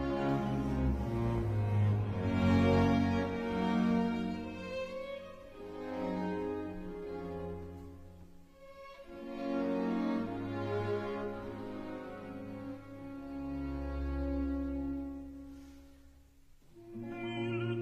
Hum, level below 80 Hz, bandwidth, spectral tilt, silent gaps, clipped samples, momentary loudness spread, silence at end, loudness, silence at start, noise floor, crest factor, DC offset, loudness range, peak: none; -48 dBFS; 12 kHz; -8 dB/octave; none; under 0.1%; 18 LU; 0 s; -35 LUFS; 0 s; -60 dBFS; 18 dB; under 0.1%; 10 LU; -18 dBFS